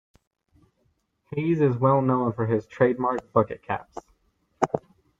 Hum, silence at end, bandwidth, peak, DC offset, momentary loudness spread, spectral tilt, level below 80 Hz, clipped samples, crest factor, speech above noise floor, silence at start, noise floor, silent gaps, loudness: none; 0.4 s; 7.8 kHz; -2 dBFS; under 0.1%; 12 LU; -8.5 dB/octave; -62 dBFS; under 0.1%; 24 dB; 47 dB; 1.3 s; -70 dBFS; none; -25 LUFS